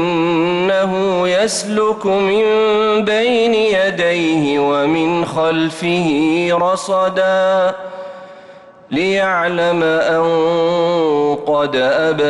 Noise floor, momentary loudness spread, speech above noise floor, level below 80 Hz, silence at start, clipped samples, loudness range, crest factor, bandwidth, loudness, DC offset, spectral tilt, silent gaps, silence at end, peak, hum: -40 dBFS; 3 LU; 25 dB; -54 dBFS; 0 s; under 0.1%; 3 LU; 8 dB; 12 kHz; -15 LUFS; under 0.1%; -5 dB/octave; none; 0 s; -6 dBFS; none